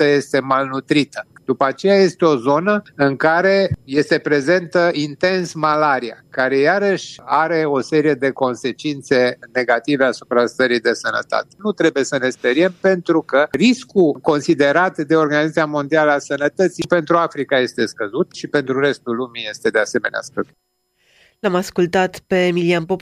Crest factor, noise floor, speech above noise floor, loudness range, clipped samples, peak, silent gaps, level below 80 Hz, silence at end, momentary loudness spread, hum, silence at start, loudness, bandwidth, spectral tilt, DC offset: 14 dB; -58 dBFS; 41 dB; 4 LU; under 0.1%; -2 dBFS; none; -58 dBFS; 0 s; 7 LU; none; 0 s; -17 LUFS; 13.5 kHz; -5.5 dB/octave; under 0.1%